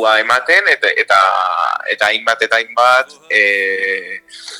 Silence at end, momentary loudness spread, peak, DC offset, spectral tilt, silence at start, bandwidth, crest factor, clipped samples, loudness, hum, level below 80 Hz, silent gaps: 0 s; 6 LU; 0 dBFS; under 0.1%; -0.5 dB/octave; 0 s; 20 kHz; 14 dB; under 0.1%; -13 LUFS; none; -66 dBFS; none